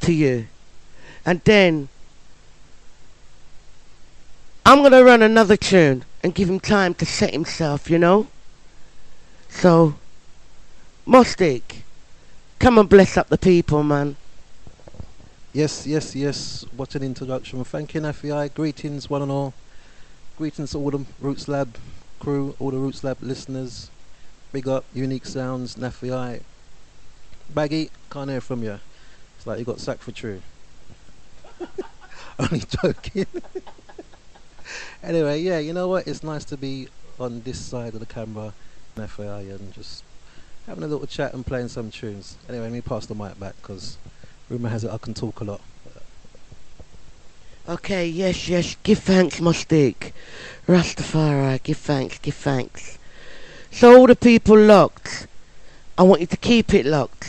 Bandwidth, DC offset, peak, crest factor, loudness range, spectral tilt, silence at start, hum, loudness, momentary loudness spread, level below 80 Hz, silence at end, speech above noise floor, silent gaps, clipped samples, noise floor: 11 kHz; under 0.1%; 0 dBFS; 20 dB; 18 LU; -6 dB/octave; 0 s; none; -19 LUFS; 23 LU; -44 dBFS; 0 s; 24 dB; none; under 0.1%; -43 dBFS